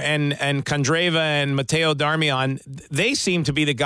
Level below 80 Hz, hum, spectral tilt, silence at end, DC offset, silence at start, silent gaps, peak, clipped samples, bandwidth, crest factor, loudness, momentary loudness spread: -52 dBFS; none; -4.5 dB/octave; 0 s; under 0.1%; 0 s; none; -8 dBFS; under 0.1%; 11 kHz; 14 dB; -21 LUFS; 4 LU